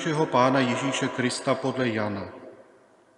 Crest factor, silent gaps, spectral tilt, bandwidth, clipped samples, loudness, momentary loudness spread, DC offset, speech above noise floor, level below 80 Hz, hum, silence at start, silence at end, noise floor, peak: 20 dB; none; -5 dB/octave; 11 kHz; under 0.1%; -25 LUFS; 13 LU; under 0.1%; 32 dB; -72 dBFS; none; 0 s; 0.6 s; -57 dBFS; -6 dBFS